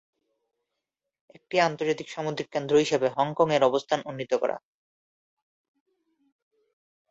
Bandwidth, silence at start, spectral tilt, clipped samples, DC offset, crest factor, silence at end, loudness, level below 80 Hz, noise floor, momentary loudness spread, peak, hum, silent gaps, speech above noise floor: 8 kHz; 1.5 s; -5 dB/octave; under 0.1%; under 0.1%; 22 dB; 2.55 s; -26 LUFS; -70 dBFS; -85 dBFS; 9 LU; -8 dBFS; none; none; 60 dB